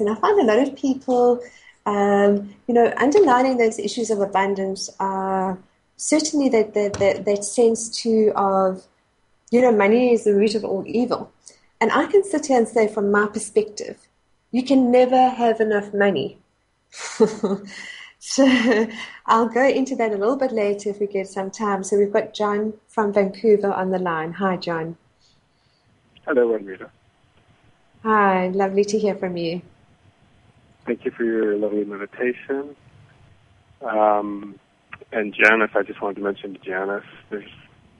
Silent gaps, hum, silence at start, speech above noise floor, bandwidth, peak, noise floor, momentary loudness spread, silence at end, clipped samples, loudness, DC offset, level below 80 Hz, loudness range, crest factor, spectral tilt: none; none; 0 s; 46 dB; 11.5 kHz; 0 dBFS; -66 dBFS; 14 LU; 0.5 s; under 0.1%; -20 LUFS; under 0.1%; -62 dBFS; 7 LU; 20 dB; -4.5 dB/octave